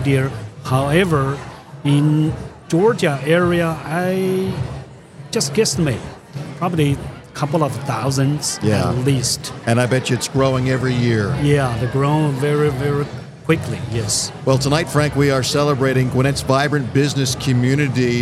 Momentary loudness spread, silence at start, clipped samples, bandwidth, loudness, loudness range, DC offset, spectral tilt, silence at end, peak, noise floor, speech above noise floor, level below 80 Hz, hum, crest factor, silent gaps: 9 LU; 0 s; under 0.1%; 14.5 kHz; -18 LUFS; 4 LU; under 0.1%; -5.5 dB/octave; 0 s; 0 dBFS; -37 dBFS; 20 dB; -42 dBFS; none; 18 dB; none